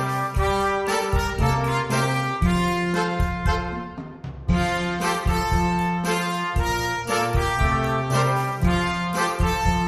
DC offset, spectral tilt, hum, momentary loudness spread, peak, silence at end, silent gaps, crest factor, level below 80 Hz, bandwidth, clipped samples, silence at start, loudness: under 0.1%; -5.5 dB/octave; none; 3 LU; -6 dBFS; 0 s; none; 16 dB; -30 dBFS; 15 kHz; under 0.1%; 0 s; -23 LUFS